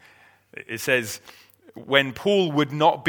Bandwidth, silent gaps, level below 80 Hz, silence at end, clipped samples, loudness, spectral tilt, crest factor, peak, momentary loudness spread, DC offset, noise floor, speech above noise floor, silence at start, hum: over 20 kHz; none; -66 dBFS; 0 s; under 0.1%; -22 LUFS; -4.5 dB/octave; 22 dB; -2 dBFS; 17 LU; under 0.1%; -55 dBFS; 32 dB; 0.55 s; none